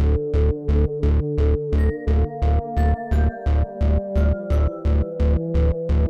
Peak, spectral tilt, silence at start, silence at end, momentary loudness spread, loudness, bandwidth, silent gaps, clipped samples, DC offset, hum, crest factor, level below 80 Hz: -8 dBFS; -10 dB/octave; 0 s; 0 s; 2 LU; -22 LUFS; 4.6 kHz; none; under 0.1%; under 0.1%; none; 10 dB; -20 dBFS